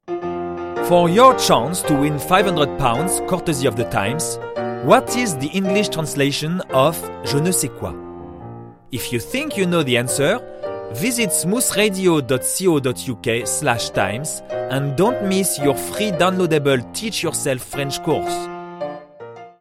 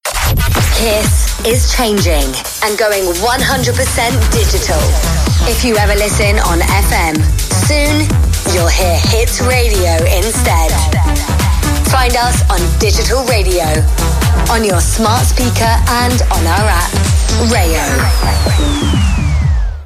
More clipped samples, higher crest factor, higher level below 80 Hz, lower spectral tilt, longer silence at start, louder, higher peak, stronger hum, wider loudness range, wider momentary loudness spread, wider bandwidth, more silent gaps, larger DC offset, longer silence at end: neither; first, 20 dB vs 10 dB; second, -46 dBFS vs -14 dBFS; about the same, -4 dB/octave vs -4 dB/octave; about the same, 0.05 s vs 0.05 s; second, -19 LUFS vs -12 LUFS; about the same, 0 dBFS vs 0 dBFS; neither; first, 5 LU vs 1 LU; first, 14 LU vs 2 LU; about the same, 16.5 kHz vs 15.5 kHz; neither; neither; about the same, 0.1 s vs 0 s